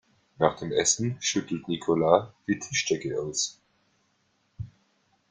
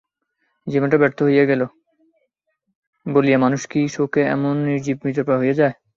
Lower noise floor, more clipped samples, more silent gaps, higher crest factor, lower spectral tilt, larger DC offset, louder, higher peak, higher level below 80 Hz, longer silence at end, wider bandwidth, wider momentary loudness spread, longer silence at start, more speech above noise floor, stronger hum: about the same, -71 dBFS vs -73 dBFS; neither; second, none vs 2.75-2.93 s; first, 26 dB vs 18 dB; second, -3.5 dB/octave vs -7 dB/octave; neither; second, -27 LUFS vs -19 LUFS; about the same, -4 dBFS vs -2 dBFS; about the same, -62 dBFS vs -62 dBFS; first, 0.65 s vs 0.25 s; first, 10 kHz vs 7.4 kHz; first, 12 LU vs 7 LU; second, 0.4 s vs 0.65 s; second, 44 dB vs 55 dB; neither